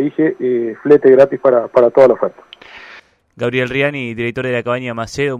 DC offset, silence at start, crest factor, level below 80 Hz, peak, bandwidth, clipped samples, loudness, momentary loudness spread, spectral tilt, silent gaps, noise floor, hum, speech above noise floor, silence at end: under 0.1%; 0 s; 14 dB; -52 dBFS; 0 dBFS; 9.8 kHz; under 0.1%; -14 LUFS; 11 LU; -6.5 dB/octave; none; -42 dBFS; none; 28 dB; 0 s